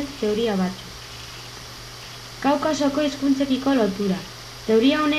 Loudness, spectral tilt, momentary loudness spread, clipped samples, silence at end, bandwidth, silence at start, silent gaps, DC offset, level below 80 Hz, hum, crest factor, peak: -22 LUFS; -5 dB/octave; 17 LU; under 0.1%; 0 s; 14 kHz; 0 s; none; under 0.1%; -50 dBFS; none; 14 dB; -8 dBFS